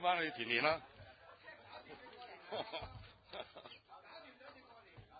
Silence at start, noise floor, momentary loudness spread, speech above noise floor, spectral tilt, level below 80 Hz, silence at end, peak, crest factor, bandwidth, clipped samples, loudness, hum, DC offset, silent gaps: 0 s; -61 dBFS; 23 LU; 21 dB; -1 dB/octave; -70 dBFS; 0 s; -20 dBFS; 24 dB; 4.9 kHz; under 0.1%; -40 LUFS; none; under 0.1%; none